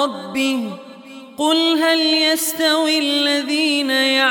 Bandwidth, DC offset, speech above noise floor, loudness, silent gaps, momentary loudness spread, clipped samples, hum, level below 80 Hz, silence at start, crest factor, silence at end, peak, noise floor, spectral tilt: 19 kHz; under 0.1%; 20 dB; -16 LUFS; none; 8 LU; under 0.1%; none; -68 dBFS; 0 s; 14 dB; 0 s; -4 dBFS; -38 dBFS; -1.5 dB/octave